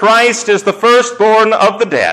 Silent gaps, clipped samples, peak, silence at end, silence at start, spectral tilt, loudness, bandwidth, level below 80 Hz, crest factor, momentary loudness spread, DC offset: none; under 0.1%; -2 dBFS; 0 s; 0 s; -3 dB/octave; -10 LUFS; 14 kHz; -58 dBFS; 8 dB; 4 LU; under 0.1%